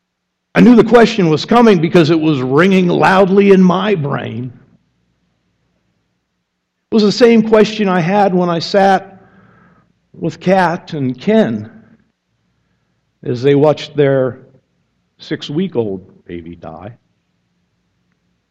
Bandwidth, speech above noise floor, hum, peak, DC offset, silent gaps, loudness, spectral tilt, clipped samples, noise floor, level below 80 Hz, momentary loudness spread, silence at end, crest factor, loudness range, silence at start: 9.2 kHz; 60 dB; none; 0 dBFS; under 0.1%; none; -12 LUFS; -7 dB/octave; under 0.1%; -72 dBFS; -50 dBFS; 17 LU; 1.6 s; 14 dB; 13 LU; 0.55 s